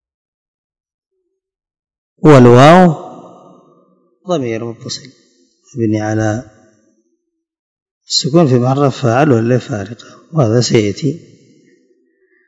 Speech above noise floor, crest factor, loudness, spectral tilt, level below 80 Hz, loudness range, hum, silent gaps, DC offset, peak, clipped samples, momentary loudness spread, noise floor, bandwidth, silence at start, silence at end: 58 dB; 14 dB; -11 LUFS; -6 dB/octave; -50 dBFS; 11 LU; none; 7.59-7.76 s, 7.82-8.01 s; under 0.1%; 0 dBFS; 1%; 20 LU; -68 dBFS; 11 kHz; 2.2 s; 1.3 s